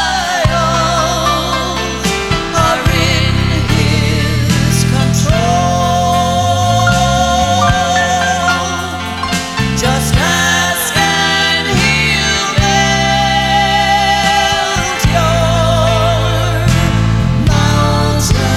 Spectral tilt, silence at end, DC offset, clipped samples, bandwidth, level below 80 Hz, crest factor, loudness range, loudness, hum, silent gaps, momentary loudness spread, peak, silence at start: -4 dB/octave; 0 s; 0.3%; under 0.1%; 16.5 kHz; -24 dBFS; 12 dB; 2 LU; -12 LUFS; none; none; 4 LU; 0 dBFS; 0 s